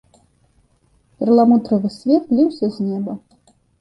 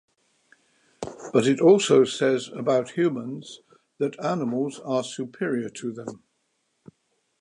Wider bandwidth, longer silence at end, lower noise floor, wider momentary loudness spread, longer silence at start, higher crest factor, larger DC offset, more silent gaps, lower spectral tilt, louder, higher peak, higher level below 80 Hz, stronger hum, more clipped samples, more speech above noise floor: second, 9 kHz vs 11 kHz; second, 0.65 s vs 1.25 s; second, -59 dBFS vs -73 dBFS; second, 12 LU vs 20 LU; first, 1.2 s vs 1 s; about the same, 16 dB vs 20 dB; neither; neither; first, -9 dB/octave vs -5 dB/octave; first, -17 LUFS vs -24 LUFS; first, -2 dBFS vs -6 dBFS; first, -60 dBFS vs -70 dBFS; neither; neither; second, 43 dB vs 50 dB